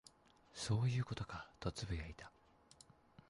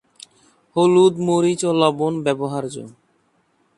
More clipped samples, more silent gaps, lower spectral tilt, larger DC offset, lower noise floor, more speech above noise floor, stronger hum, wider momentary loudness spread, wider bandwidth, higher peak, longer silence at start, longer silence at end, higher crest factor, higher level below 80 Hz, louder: neither; neither; about the same, -5.5 dB/octave vs -6 dB/octave; neither; first, -67 dBFS vs -63 dBFS; second, 26 dB vs 46 dB; neither; first, 26 LU vs 13 LU; about the same, 11.5 kHz vs 11.5 kHz; second, -28 dBFS vs 0 dBFS; second, 0.55 s vs 0.75 s; about the same, 1 s vs 0.9 s; about the same, 16 dB vs 20 dB; first, -58 dBFS vs -66 dBFS; second, -43 LUFS vs -18 LUFS